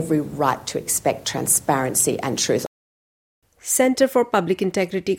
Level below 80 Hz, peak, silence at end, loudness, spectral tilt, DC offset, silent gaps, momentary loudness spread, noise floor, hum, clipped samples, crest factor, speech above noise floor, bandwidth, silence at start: -58 dBFS; -4 dBFS; 0 s; -20 LUFS; -3.5 dB/octave; under 0.1%; 2.67-3.42 s; 6 LU; under -90 dBFS; none; under 0.1%; 18 dB; over 69 dB; 17 kHz; 0 s